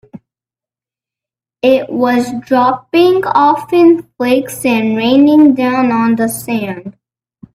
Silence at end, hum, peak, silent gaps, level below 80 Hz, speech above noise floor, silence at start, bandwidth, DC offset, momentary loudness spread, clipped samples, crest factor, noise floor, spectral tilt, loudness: 0.65 s; none; 0 dBFS; none; -56 dBFS; 78 dB; 0.15 s; 16 kHz; under 0.1%; 8 LU; under 0.1%; 12 dB; -89 dBFS; -5 dB/octave; -12 LUFS